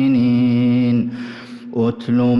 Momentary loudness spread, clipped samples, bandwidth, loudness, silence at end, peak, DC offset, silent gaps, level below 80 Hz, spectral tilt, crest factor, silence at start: 15 LU; under 0.1%; 5.8 kHz; -17 LUFS; 0 s; -8 dBFS; under 0.1%; none; -56 dBFS; -9.5 dB/octave; 8 dB; 0 s